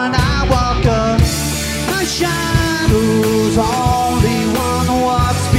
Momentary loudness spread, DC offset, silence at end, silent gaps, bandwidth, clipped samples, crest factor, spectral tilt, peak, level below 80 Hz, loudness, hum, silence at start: 3 LU; under 0.1%; 0 s; none; 16 kHz; under 0.1%; 14 dB; -5 dB/octave; 0 dBFS; -24 dBFS; -15 LUFS; none; 0 s